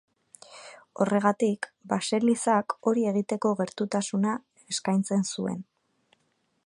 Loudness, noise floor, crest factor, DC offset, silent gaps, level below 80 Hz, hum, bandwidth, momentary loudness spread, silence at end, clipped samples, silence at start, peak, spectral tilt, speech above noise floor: -27 LUFS; -73 dBFS; 20 dB; under 0.1%; none; -74 dBFS; none; 11.5 kHz; 14 LU; 1.05 s; under 0.1%; 0.5 s; -8 dBFS; -5 dB/octave; 46 dB